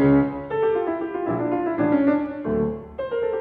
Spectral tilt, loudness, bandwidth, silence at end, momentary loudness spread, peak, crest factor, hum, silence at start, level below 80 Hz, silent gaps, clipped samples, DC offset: -11 dB/octave; -23 LUFS; 4.2 kHz; 0 s; 7 LU; -8 dBFS; 14 dB; none; 0 s; -48 dBFS; none; under 0.1%; under 0.1%